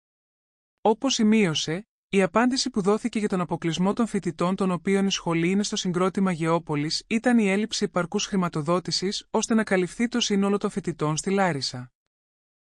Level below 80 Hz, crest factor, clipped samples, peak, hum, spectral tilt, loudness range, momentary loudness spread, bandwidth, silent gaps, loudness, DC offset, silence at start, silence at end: -58 dBFS; 16 dB; under 0.1%; -8 dBFS; none; -4.5 dB/octave; 1 LU; 5 LU; 11.5 kHz; 1.88-2.10 s; -24 LUFS; under 0.1%; 0.85 s; 0.75 s